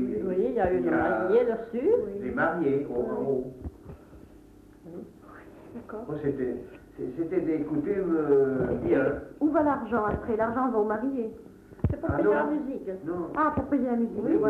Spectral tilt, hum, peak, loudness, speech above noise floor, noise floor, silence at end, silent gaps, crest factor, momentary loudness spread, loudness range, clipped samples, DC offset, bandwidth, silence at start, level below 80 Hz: -9.5 dB/octave; none; -12 dBFS; -27 LUFS; 25 dB; -52 dBFS; 0 s; none; 16 dB; 18 LU; 11 LU; under 0.1%; under 0.1%; 4.7 kHz; 0 s; -50 dBFS